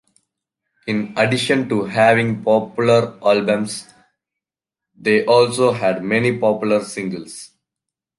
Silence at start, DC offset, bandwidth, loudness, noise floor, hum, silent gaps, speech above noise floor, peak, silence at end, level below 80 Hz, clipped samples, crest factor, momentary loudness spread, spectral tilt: 0.85 s; under 0.1%; 11.5 kHz; -17 LUFS; -87 dBFS; none; none; 70 dB; -2 dBFS; 0.75 s; -60 dBFS; under 0.1%; 18 dB; 13 LU; -5.5 dB/octave